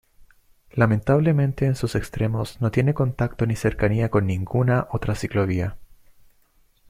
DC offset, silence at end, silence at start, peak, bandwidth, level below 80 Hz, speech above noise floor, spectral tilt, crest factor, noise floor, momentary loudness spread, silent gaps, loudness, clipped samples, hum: under 0.1%; 1.05 s; 0.75 s; -4 dBFS; 15 kHz; -42 dBFS; 39 dB; -8 dB/octave; 18 dB; -60 dBFS; 7 LU; none; -23 LUFS; under 0.1%; none